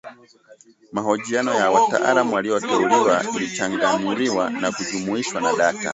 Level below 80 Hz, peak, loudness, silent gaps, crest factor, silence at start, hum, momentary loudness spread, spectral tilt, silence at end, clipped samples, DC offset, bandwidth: -64 dBFS; -4 dBFS; -20 LUFS; none; 18 dB; 0.05 s; none; 7 LU; -3.5 dB/octave; 0 s; under 0.1%; under 0.1%; 8.2 kHz